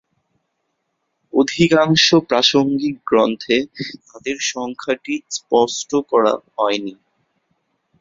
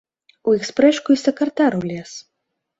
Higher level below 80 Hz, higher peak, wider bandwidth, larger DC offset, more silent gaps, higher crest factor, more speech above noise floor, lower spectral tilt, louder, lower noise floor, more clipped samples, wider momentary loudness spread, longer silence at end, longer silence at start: about the same, -58 dBFS vs -62 dBFS; about the same, -2 dBFS vs -2 dBFS; about the same, 7.8 kHz vs 8 kHz; neither; neither; about the same, 18 dB vs 16 dB; second, 55 dB vs 59 dB; second, -4 dB/octave vs -5.5 dB/octave; about the same, -17 LUFS vs -18 LUFS; second, -72 dBFS vs -77 dBFS; neither; second, 13 LU vs 16 LU; first, 1.1 s vs 0.6 s; first, 1.35 s vs 0.45 s